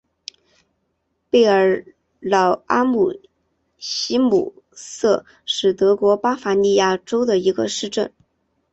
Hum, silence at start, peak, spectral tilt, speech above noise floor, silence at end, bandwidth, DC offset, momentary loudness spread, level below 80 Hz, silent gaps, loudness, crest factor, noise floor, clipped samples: none; 1.35 s; -4 dBFS; -4 dB/octave; 53 dB; 0.65 s; 8.2 kHz; under 0.1%; 16 LU; -60 dBFS; none; -19 LUFS; 16 dB; -71 dBFS; under 0.1%